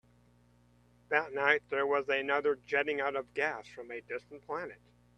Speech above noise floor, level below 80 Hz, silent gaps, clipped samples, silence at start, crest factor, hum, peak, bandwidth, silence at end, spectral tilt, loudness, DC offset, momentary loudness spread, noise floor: 32 dB; -72 dBFS; none; under 0.1%; 1.1 s; 24 dB; 60 Hz at -60 dBFS; -10 dBFS; 9 kHz; 0.4 s; -4.5 dB/octave; -32 LUFS; under 0.1%; 14 LU; -65 dBFS